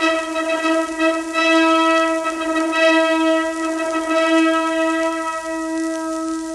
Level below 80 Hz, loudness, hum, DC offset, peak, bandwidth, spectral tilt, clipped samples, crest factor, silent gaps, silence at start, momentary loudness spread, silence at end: -56 dBFS; -18 LUFS; none; under 0.1%; -4 dBFS; 12.5 kHz; -2 dB/octave; under 0.1%; 14 dB; none; 0 s; 9 LU; 0 s